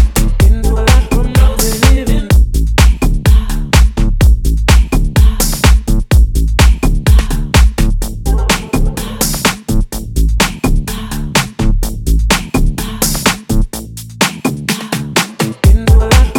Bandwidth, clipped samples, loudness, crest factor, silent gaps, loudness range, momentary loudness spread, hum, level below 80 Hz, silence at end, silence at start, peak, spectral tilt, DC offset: 17.5 kHz; under 0.1%; -13 LUFS; 10 dB; none; 4 LU; 7 LU; none; -12 dBFS; 0 s; 0 s; 0 dBFS; -4.5 dB/octave; under 0.1%